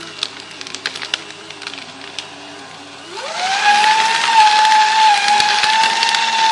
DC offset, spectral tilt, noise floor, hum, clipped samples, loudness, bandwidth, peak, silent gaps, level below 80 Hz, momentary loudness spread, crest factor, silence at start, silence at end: under 0.1%; 1 dB/octave; -34 dBFS; none; under 0.1%; -13 LUFS; 11.5 kHz; 0 dBFS; none; -64 dBFS; 20 LU; 16 dB; 0 s; 0 s